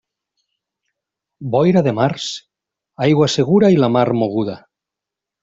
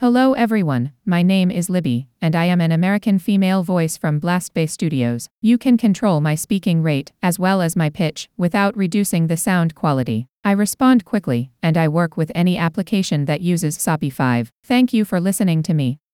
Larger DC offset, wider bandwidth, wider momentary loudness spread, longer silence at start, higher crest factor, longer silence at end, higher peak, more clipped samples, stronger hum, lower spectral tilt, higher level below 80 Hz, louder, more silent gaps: neither; second, 7.8 kHz vs 16.5 kHz; first, 13 LU vs 5 LU; first, 1.4 s vs 0 s; about the same, 16 dB vs 16 dB; first, 0.85 s vs 0.2 s; about the same, -2 dBFS vs -2 dBFS; neither; neither; about the same, -6.5 dB/octave vs -6 dB/octave; about the same, -56 dBFS vs -56 dBFS; about the same, -16 LUFS vs -18 LUFS; second, none vs 5.31-5.42 s, 10.31-10.43 s, 14.52-14.63 s